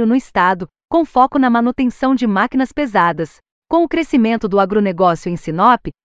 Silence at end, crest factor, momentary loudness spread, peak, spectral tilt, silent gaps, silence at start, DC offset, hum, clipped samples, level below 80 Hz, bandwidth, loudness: 0.15 s; 14 dB; 6 LU; 0 dBFS; -7 dB/octave; 3.52-3.62 s; 0 s; under 0.1%; none; under 0.1%; -46 dBFS; 8 kHz; -15 LUFS